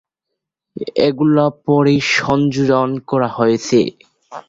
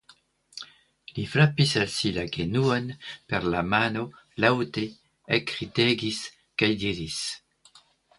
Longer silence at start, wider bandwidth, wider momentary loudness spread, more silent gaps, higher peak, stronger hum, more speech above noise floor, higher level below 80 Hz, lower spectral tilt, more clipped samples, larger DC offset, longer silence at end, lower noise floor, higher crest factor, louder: first, 0.75 s vs 0.55 s; second, 7.8 kHz vs 11.5 kHz; second, 8 LU vs 17 LU; neither; first, 0 dBFS vs -4 dBFS; neither; first, 64 dB vs 34 dB; about the same, -52 dBFS vs -54 dBFS; about the same, -6 dB/octave vs -5 dB/octave; neither; neither; second, 0.1 s vs 0.8 s; first, -79 dBFS vs -59 dBFS; second, 16 dB vs 24 dB; first, -15 LUFS vs -26 LUFS